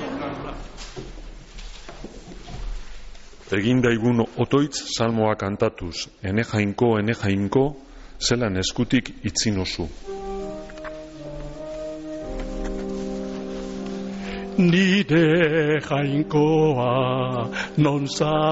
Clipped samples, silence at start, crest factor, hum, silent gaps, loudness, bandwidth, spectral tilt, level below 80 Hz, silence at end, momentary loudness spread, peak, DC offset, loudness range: under 0.1%; 0 s; 16 dB; none; none; -23 LUFS; 8 kHz; -5 dB/octave; -40 dBFS; 0 s; 19 LU; -8 dBFS; under 0.1%; 12 LU